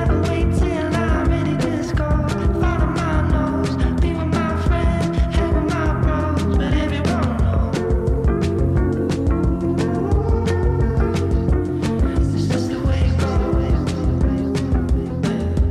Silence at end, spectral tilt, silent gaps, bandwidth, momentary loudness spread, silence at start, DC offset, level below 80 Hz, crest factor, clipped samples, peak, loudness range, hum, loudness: 0 s; -7.5 dB/octave; none; 11 kHz; 2 LU; 0 s; under 0.1%; -22 dBFS; 12 dB; under 0.1%; -6 dBFS; 0 LU; none; -20 LUFS